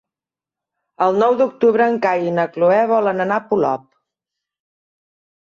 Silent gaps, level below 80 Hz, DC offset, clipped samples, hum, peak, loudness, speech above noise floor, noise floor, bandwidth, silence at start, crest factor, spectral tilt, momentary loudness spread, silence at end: none; -66 dBFS; under 0.1%; under 0.1%; none; -4 dBFS; -17 LUFS; 73 dB; -89 dBFS; 7.2 kHz; 1 s; 16 dB; -7.5 dB/octave; 5 LU; 1.7 s